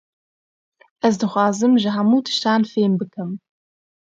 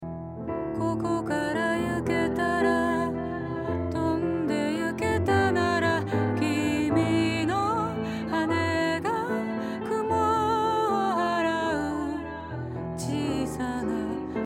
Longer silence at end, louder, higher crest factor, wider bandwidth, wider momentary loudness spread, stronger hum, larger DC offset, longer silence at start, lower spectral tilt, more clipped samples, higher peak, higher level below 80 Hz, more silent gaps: first, 0.8 s vs 0 s; first, -19 LUFS vs -27 LUFS; about the same, 18 dB vs 16 dB; second, 7.8 kHz vs 16 kHz; first, 12 LU vs 8 LU; neither; neither; first, 1.05 s vs 0 s; about the same, -5.5 dB/octave vs -6 dB/octave; neither; first, -2 dBFS vs -10 dBFS; second, -68 dBFS vs -54 dBFS; neither